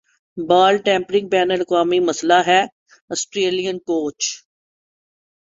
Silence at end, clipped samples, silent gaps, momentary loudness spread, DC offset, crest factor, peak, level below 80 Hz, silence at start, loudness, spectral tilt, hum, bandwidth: 1.2 s; under 0.1%; 2.72-2.86 s, 3.01-3.08 s; 13 LU; under 0.1%; 18 dB; -2 dBFS; -64 dBFS; 0.35 s; -18 LUFS; -3 dB/octave; none; 7.8 kHz